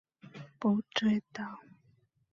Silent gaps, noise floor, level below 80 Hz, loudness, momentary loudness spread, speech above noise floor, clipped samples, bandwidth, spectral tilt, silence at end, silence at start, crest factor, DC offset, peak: none; -69 dBFS; -74 dBFS; -33 LUFS; 21 LU; 38 dB; under 0.1%; 7.2 kHz; -6 dB/octave; 0.7 s; 0.25 s; 20 dB; under 0.1%; -14 dBFS